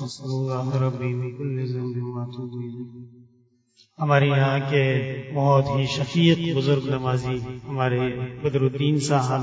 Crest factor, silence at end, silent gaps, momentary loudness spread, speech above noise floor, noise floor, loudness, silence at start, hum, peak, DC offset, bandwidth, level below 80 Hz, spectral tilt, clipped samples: 20 dB; 0 s; none; 12 LU; 38 dB; -61 dBFS; -24 LUFS; 0 s; none; -4 dBFS; under 0.1%; 8 kHz; -54 dBFS; -6.5 dB/octave; under 0.1%